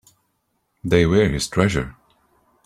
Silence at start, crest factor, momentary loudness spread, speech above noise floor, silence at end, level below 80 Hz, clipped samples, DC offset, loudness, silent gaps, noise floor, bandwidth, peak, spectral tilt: 0.85 s; 20 dB; 15 LU; 53 dB; 0.75 s; -40 dBFS; under 0.1%; under 0.1%; -19 LUFS; none; -71 dBFS; 14.5 kHz; -2 dBFS; -5.5 dB/octave